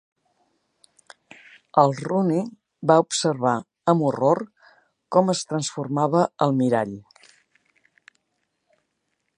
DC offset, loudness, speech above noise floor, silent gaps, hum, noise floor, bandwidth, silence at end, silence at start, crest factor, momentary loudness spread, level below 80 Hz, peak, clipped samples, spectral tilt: under 0.1%; -22 LUFS; 55 dB; none; none; -75 dBFS; 10.5 kHz; 2.4 s; 1.75 s; 22 dB; 8 LU; -70 dBFS; -2 dBFS; under 0.1%; -5.5 dB/octave